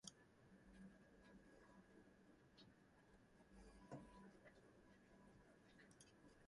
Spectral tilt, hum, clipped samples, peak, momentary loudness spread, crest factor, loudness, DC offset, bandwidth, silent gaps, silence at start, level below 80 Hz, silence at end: -4.5 dB/octave; none; under 0.1%; -38 dBFS; 8 LU; 30 dB; -67 LUFS; under 0.1%; 11 kHz; none; 0 s; -78 dBFS; 0 s